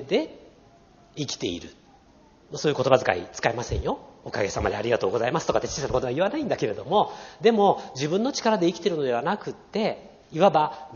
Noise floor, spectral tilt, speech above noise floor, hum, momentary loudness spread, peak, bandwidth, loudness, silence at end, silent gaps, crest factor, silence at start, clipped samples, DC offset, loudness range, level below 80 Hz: -55 dBFS; -4 dB/octave; 31 dB; none; 11 LU; -2 dBFS; 7.2 kHz; -25 LUFS; 0 s; none; 22 dB; 0 s; under 0.1%; under 0.1%; 3 LU; -48 dBFS